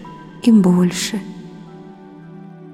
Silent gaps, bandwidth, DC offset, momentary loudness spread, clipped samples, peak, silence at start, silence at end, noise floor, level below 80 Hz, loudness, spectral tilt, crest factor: none; 15 kHz; under 0.1%; 26 LU; under 0.1%; -2 dBFS; 0 s; 0.05 s; -38 dBFS; -54 dBFS; -16 LUFS; -6 dB/octave; 16 dB